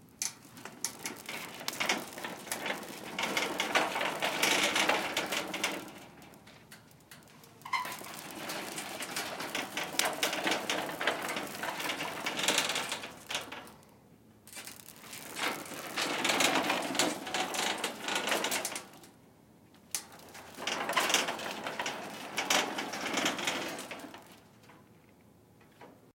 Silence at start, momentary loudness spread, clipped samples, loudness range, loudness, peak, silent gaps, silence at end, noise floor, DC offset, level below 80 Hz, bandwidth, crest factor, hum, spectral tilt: 0 s; 19 LU; under 0.1%; 8 LU; -33 LUFS; -8 dBFS; none; 0.05 s; -60 dBFS; under 0.1%; -76 dBFS; 17 kHz; 28 dB; none; -1 dB/octave